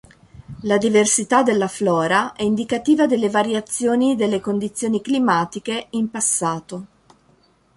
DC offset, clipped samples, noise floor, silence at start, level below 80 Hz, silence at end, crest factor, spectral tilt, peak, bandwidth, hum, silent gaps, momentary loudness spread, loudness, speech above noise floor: under 0.1%; under 0.1%; -57 dBFS; 0.35 s; -58 dBFS; 0.9 s; 18 dB; -4 dB/octave; -2 dBFS; 11.5 kHz; none; none; 9 LU; -19 LUFS; 38 dB